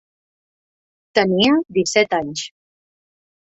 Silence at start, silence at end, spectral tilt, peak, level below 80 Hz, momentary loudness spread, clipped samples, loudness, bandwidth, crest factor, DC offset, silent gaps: 1.15 s; 0.95 s; -4 dB/octave; -2 dBFS; -58 dBFS; 13 LU; under 0.1%; -18 LUFS; 8.4 kHz; 20 dB; under 0.1%; none